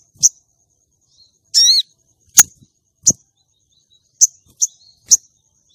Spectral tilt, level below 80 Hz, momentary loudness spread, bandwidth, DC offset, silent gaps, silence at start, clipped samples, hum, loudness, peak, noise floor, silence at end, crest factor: 2 dB/octave; -60 dBFS; 10 LU; 16 kHz; under 0.1%; none; 0.2 s; 0.2%; none; -13 LUFS; 0 dBFS; -63 dBFS; 0.6 s; 18 dB